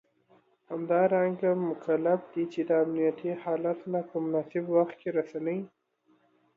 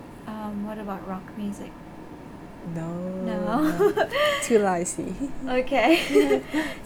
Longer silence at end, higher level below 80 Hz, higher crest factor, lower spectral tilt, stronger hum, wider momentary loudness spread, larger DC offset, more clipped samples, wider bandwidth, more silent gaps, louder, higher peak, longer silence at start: first, 0.9 s vs 0 s; second, -80 dBFS vs -48 dBFS; about the same, 16 dB vs 18 dB; first, -9.5 dB/octave vs -4.5 dB/octave; neither; second, 8 LU vs 20 LU; neither; neither; second, 6.8 kHz vs 20 kHz; neither; second, -29 LUFS vs -25 LUFS; second, -14 dBFS vs -8 dBFS; first, 0.7 s vs 0 s